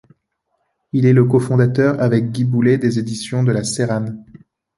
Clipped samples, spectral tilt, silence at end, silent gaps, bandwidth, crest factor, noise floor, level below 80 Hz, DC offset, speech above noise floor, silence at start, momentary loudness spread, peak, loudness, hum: under 0.1%; -7 dB/octave; 0.55 s; none; 11.5 kHz; 16 dB; -70 dBFS; -54 dBFS; under 0.1%; 55 dB; 0.95 s; 9 LU; -2 dBFS; -16 LUFS; none